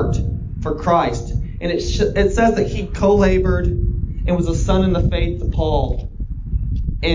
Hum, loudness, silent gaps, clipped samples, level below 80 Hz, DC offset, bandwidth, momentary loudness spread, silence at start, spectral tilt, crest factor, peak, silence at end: none; -19 LUFS; none; under 0.1%; -22 dBFS; under 0.1%; 7.6 kHz; 10 LU; 0 s; -7 dB/octave; 14 dB; -2 dBFS; 0 s